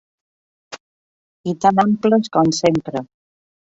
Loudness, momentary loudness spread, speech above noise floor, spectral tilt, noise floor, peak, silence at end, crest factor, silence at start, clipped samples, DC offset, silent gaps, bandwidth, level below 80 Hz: -17 LUFS; 23 LU; over 74 dB; -5.5 dB/octave; under -90 dBFS; -2 dBFS; 0.75 s; 18 dB; 0.7 s; under 0.1%; under 0.1%; 0.80-1.44 s; 8 kHz; -58 dBFS